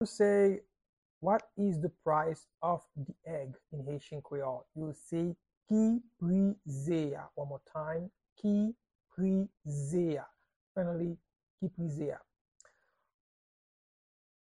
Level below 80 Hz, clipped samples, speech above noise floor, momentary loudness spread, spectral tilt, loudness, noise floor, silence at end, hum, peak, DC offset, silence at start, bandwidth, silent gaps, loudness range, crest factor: -68 dBFS; under 0.1%; 37 dB; 13 LU; -8 dB/octave; -35 LUFS; -71 dBFS; 2.35 s; none; -16 dBFS; under 0.1%; 0 s; 11 kHz; 0.89-1.21 s, 5.57-5.61 s, 8.32-8.36 s, 8.95-8.99 s, 10.56-10.75 s, 11.50-11.58 s; 7 LU; 18 dB